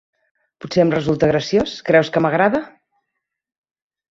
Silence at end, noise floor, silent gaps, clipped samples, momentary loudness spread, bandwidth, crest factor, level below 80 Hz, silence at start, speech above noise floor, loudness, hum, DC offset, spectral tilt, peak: 1.45 s; -79 dBFS; none; under 0.1%; 6 LU; 7.8 kHz; 18 dB; -50 dBFS; 0.65 s; 62 dB; -17 LUFS; none; under 0.1%; -6.5 dB/octave; 0 dBFS